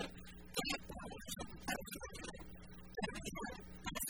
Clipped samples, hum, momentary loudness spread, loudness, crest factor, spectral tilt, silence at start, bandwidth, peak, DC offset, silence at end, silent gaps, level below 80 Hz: under 0.1%; none; 11 LU; -46 LUFS; 22 dB; -3 dB/octave; 0 s; 19.5 kHz; -24 dBFS; 0.1%; 0 s; none; -58 dBFS